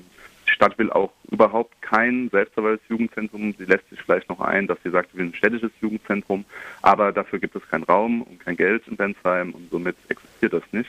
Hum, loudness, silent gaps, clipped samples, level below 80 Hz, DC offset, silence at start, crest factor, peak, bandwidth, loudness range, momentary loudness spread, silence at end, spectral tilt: none; -22 LUFS; none; under 0.1%; -60 dBFS; under 0.1%; 0.25 s; 20 dB; -2 dBFS; 13 kHz; 2 LU; 10 LU; 0 s; -6.5 dB/octave